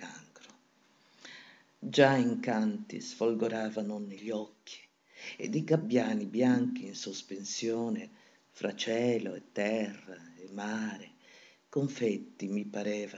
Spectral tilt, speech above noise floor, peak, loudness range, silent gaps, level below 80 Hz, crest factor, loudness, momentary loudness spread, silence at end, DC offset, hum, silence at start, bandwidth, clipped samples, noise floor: -5.5 dB/octave; 35 dB; -10 dBFS; 5 LU; none; under -90 dBFS; 24 dB; -33 LUFS; 21 LU; 0 s; under 0.1%; none; 0 s; 8 kHz; under 0.1%; -67 dBFS